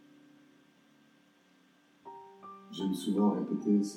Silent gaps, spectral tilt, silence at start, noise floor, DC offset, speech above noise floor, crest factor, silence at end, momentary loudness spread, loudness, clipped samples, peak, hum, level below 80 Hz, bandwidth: none; -7 dB/octave; 2.05 s; -66 dBFS; under 0.1%; 35 dB; 18 dB; 0 s; 22 LU; -32 LUFS; under 0.1%; -18 dBFS; none; under -90 dBFS; 14.5 kHz